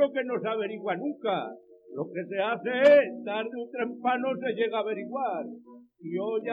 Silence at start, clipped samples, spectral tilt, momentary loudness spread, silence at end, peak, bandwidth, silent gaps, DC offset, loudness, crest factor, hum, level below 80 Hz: 0 s; under 0.1%; -6.5 dB/octave; 15 LU; 0 s; -8 dBFS; 7.6 kHz; none; under 0.1%; -28 LUFS; 20 dB; none; under -90 dBFS